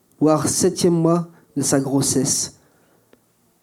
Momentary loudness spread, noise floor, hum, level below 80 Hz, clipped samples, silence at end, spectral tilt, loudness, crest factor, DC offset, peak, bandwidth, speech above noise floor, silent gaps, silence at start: 6 LU; -58 dBFS; none; -56 dBFS; under 0.1%; 1.1 s; -4.5 dB/octave; -19 LUFS; 18 dB; under 0.1%; -4 dBFS; 17 kHz; 40 dB; none; 0.2 s